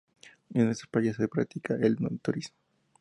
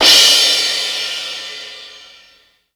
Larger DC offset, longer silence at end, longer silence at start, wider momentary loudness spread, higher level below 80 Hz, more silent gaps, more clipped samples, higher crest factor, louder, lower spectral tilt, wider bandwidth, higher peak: neither; second, 0.5 s vs 0.8 s; first, 0.25 s vs 0 s; second, 6 LU vs 23 LU; second, -66 dBFS vs -56 dBFS; neither; neither; about the same, 18 dB vs 16 dB; second, -30 LUFS vs -11 LUFS; first, -7 dB/octave vs 2 dB/octave; second, 11 kHz vs over 20 kHz; second, -12 dBFS vs 0 dBFS